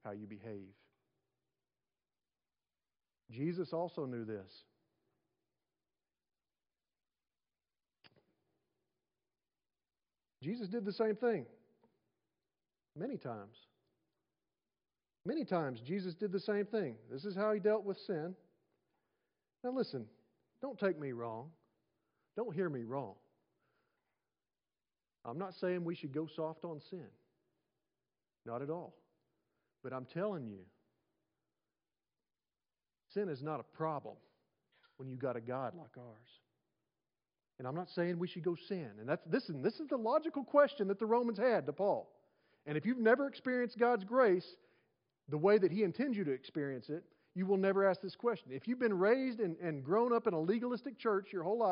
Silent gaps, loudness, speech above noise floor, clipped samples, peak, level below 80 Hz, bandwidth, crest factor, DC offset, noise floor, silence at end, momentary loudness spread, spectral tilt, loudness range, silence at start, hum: none; -37 LUFS; over 53 dB; under 0.1%; -16 dBFS; under -90 dBFS; 5.2 kHz; 24 dB; under 0.1%; under -90 dBFS; 0 s; 17 LU; -5.5 dB/octave; 14 LU; 0.05 s; none